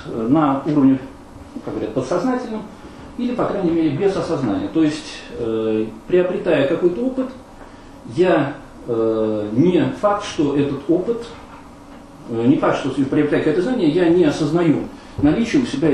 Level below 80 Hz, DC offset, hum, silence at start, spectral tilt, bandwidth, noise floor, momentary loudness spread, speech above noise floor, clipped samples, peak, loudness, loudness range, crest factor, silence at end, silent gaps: -46 dBFS; under 0.1%; none; 0 s; -7 dB/octave; 11 kHz; -40 dBFS; 15 LU; 22 dB; under 0.1%; -4 dBFS; -19 LUFS; 4 LU; 16 dB; 0 s; none